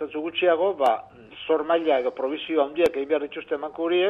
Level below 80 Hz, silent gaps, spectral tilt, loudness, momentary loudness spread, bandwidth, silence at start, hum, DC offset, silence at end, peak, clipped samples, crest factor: -64 dBFS; none; -5 dB/octave; -24 LUFS; 9 LU; 11.5 kHz; 0 s; none; under 0.1%; 0 s; -8 dBFS; under 0.1%; 16 dB